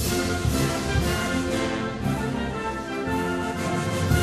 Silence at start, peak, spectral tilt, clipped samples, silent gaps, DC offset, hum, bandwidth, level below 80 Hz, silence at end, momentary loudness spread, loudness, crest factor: 0 s; -8 dBFS; -5 dB/octave; under 0.1%; none; under 0.1%; none; 13.5 kHz; -36 dBFS; 0 s; 4 LU; -26 LUFS; 16 dB